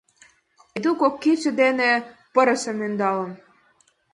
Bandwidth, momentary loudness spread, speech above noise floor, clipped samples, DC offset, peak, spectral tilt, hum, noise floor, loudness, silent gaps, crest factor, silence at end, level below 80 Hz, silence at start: 11.5 kHz; 8 LU; 41 dB; under 0.1%; under 0.1%; -4 dBFS; -4.5 dB/octave; none; -62 dBFS; -21 LUFS; none; 18 dB; 0.75 s; -70 dBFS; 0.75 s